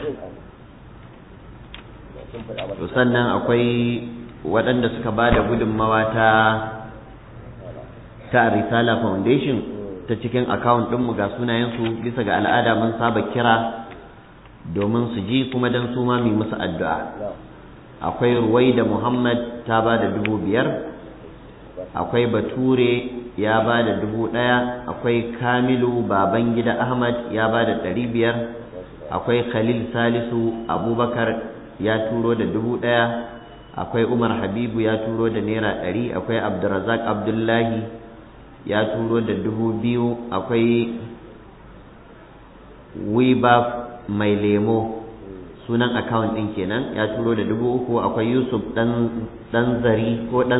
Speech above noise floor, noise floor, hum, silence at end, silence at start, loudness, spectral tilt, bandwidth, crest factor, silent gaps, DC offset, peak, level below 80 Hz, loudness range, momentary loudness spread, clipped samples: 24 dB; -44 dBFS; none; 0 s; 0 s; -21 LUFS; -10.5 dB/octave; 4 kHz; 18 dB; none; under 0.1%; -4 dBFS; -46 dBFS; 3 LU; 17 LU; under 0.1%